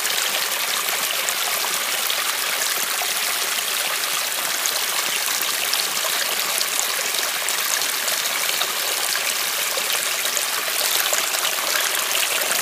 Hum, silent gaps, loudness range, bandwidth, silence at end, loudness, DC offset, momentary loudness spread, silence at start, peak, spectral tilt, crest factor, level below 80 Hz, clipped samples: none; none; 1 LU; 16.5 kHz; 0 s; -20 LUFS; under 0.1%; 2 LU; 0 s; 0 dBFS; 2 dB/octave; 22 dB; -76 dBFS; under 0.1%